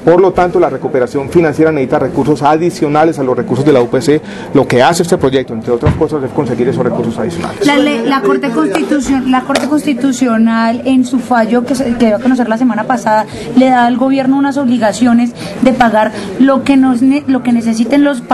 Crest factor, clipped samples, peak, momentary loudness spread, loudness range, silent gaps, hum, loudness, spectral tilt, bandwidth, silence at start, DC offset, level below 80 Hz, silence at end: 10 dB; 0.2%; 0 dBFS; 5 LU; 2 LU; none; none; -11 LUFS; -6 dB/octave; 12.5 kHz; 0 s; under 0.1%; -40 dBFS; 0 s